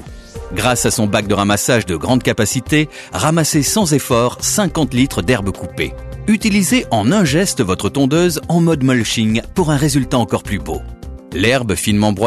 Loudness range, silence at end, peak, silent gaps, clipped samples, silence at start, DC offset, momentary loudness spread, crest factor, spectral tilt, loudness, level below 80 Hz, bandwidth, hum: 2 LU; 0 s; -2 dBFS; none; under 0.1%; 0 s; under 0.1%; 9 LU; 12 dB; -4.5 dB/octave; -15 LUFS; -34 dBFS; 13 kHz; none